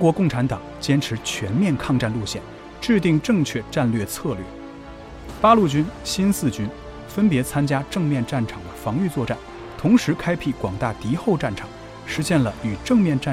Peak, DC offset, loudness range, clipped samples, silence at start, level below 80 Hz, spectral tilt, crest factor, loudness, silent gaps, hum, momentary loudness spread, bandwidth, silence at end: -4 dBFS; under 0.1%; 2 LU; under 0.1%; 0 s; -44 dBFS; -6 dB/octave; 18 dB; -22 LUFS; none; none; 14 LU; 16 kHz; 0 s